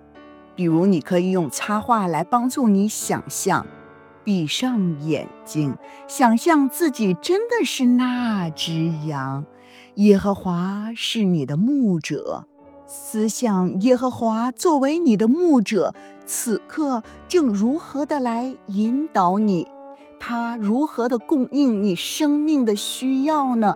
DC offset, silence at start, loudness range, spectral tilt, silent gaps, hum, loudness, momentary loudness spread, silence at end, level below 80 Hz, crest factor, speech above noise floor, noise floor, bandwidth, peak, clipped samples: under 0.1%; 0.15 s; 3 LU; -5.5 dB/octave; none; none; -21 LUFS; 9 LU; 0 s; -60 dBFS; 18 dB; 25 dB; -45 dBFS; 19.5 kHz; -2 dBFS; under 0.1%